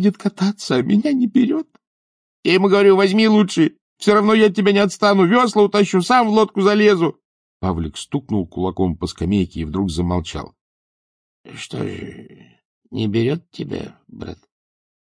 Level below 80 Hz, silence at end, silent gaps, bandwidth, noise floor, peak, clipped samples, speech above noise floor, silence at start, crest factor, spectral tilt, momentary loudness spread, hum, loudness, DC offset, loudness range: -44 dBFS; 0.7 s; 1.87-2.43 s, 3.81-3.96 s, 7.25-7.60 s, 10.61-11.44 s, 12.65-12.82 s; 10.5 kHz; under -90 dBFS; -2 dBFS; under 0.1%; over 73 dB; 0 s; 16 dB; -6 dB/octave; 17 LU; none; -17 LUFS; under 0.1%; 12 LU